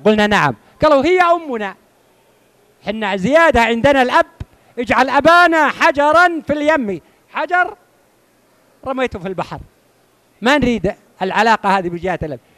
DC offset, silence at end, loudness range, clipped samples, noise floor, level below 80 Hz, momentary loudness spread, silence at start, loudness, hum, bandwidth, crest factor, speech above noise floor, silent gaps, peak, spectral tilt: under 0.1%; 0.2 s; 9 LU; under 0.1%; -55 dBFS; -42 dBFS; 15 LU; 0.05 s; -14 LUFS; none; 14 kHz; 14 dB; 41 dB; none; -2 dBFS; -5 dB/octave